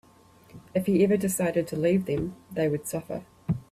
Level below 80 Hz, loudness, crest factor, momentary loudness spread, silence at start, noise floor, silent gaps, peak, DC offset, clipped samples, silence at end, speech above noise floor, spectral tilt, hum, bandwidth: -56 dBFS; -27 LUFS; 16 dB; 11 LU; 0.55 s; -56 dBFS; none; -12 dBFS; under 0.1%; under 0.1%; 0.1 s; 30 dB; -6.5 dB/octave; none; 15 kHz